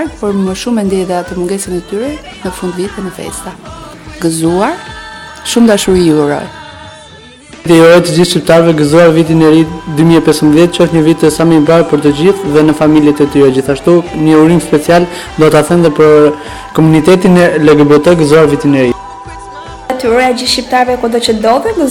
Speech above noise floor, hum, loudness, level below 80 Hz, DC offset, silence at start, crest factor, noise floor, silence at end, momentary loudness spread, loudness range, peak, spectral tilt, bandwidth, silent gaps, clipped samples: 26 dB; none; -8 LUFS; -36 dBFS; under 0.1%; 0 s; 8 dB; -34 dBFS; 0 s; 16 LU; 9 LU; 0 dBFS; -6 dB/octave; 16.5 kHz; none; 3%